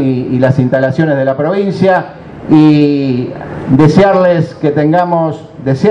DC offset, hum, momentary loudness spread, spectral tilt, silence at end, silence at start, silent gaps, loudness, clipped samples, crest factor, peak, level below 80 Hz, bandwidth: under 0.1%; none; 11 LU; -8.5 dB/octave; 0 s; 0 s; none; -10 LUFS; 0.4%; 10 dB; 0 dBFS; -42 dBFS; 8.2 kHz